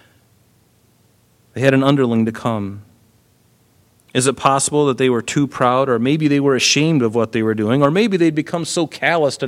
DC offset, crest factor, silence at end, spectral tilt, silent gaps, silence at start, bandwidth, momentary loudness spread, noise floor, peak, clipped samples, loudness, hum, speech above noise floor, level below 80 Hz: under 0.1%; 18 dB; 0 s; -5 dB/octave; none; 1.55 s; 15 kHz; 7 LU; -56 dBFS; 0 dBFS; under 0.1%; -16 LUFS; none; 40 dB; -58 dBFS